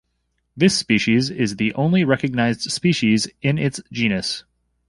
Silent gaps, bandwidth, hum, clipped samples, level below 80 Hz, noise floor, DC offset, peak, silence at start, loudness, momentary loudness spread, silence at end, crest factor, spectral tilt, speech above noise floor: none; 11.5 kHz; none; under 0.1%; -52 dBFS; -71 dBFS; under 0.1%; -2 dBFS; 0.55 s; -19 LUFS; 5 LU; 0.5 s; 18 dB; -5 dB/octave; 52 dB